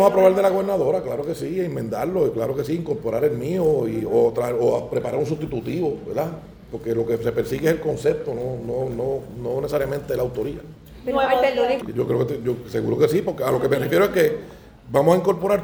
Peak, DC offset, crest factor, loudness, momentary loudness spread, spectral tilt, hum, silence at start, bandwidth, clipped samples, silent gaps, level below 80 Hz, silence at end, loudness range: -2 dBFS; under 0.1%; 20 dB; -22 LUFS; 9 LU; -7 dB/octave; none; 0 s; over 20 kHz; under 0.1%; none; -48 dBFS; 0 s; 4 LU